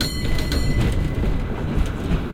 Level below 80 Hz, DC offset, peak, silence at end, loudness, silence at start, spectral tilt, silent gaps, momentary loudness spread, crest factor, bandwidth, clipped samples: -24 dBFS; under 0.1%; -8 dBFS; 0 s; -24 LUFS; 0 s; -6 dB/octave; none; 3 LU; 12 dB; 16 kHz; under 0.1%